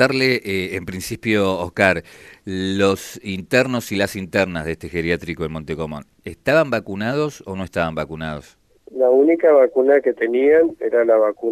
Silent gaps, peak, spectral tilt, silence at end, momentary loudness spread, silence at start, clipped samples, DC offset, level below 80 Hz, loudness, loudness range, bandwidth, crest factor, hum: none; 0 dBFS; -5.5 dB/octave; 0 s; 14 LU; 0 s; under 0.1%; under 0.1%; -48 dBFS; -19 LUFS; 6 LU; 13.5 kHz; 18 dB; none